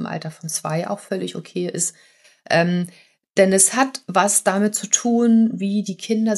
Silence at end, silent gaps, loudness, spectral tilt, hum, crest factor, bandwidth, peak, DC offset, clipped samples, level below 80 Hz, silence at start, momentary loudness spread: 0 s; none; -19 LUFS; -4 dB/octave; none; 20 dB; 13 kHz; 0 dBFS; under 0.1%; under 0.1%; -74 dBFS; 0 s; 12 LU